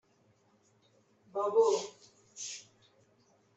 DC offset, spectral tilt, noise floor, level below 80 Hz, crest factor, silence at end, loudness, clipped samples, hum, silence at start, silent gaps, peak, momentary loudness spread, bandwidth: under 0.1%; -2.5 dB/octave; -69 dBFS; -88 dBFS; 22 dB; 0.95 s; -32 LUFS; under 0.1%; none; 1.35 s; none; -16 dBFS; 19 LU; 8.2 kHz